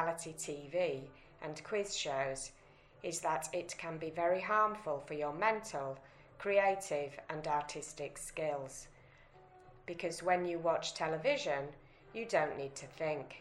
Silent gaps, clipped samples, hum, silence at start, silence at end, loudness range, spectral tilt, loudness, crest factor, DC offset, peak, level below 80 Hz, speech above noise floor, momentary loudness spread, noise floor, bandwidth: none; under 0.1%; none; 0 s; 0 s; 5 LU; -3.5 dB/octave; -37 LUFS; 20 dB; under 0.1%; -18 dBFS; -66 dBFS; 24 dB; 14 LU; -61 dBFS; 13 kHz